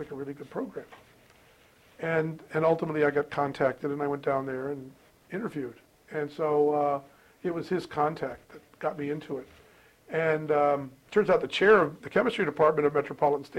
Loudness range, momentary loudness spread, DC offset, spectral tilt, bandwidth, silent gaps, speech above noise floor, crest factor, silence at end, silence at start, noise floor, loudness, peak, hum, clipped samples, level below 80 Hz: 7 LU; 14 LU; under 0.1%; -6.5 dB/octave; 12 kHz; none; 32 dB; 20 dB; 0 s; 0 s; -59 dBFS; -28 LUFS; -10 dBFS; none; under 0.1%; -66 dBFS